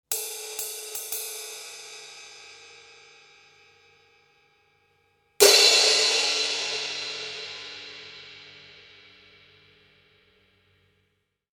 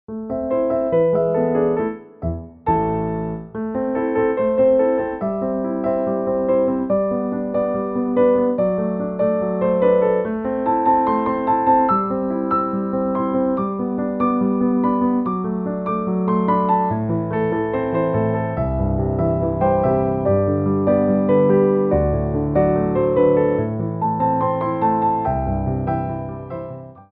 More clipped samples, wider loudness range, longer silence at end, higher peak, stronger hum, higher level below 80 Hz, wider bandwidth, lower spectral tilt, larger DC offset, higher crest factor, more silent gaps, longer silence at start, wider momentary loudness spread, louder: neither; first, 20 LU vs 3 LU; first, 3 s vs 0.1 s; about the same, -2 dBFS vs -4 dBFS; neither; second, -76 dBFS vs -38 dBFS; first, 17.5 kHz vs 4 kHz; second, 1.5 dB/octave vs -13 dB/octave; neither; first, 26 dB vs 14 dB; neither; about the same, 0.1 s vs 0.1 s; first, 28 LU vs 7 LU; about the same, -21 LUFS vs -19 LUFS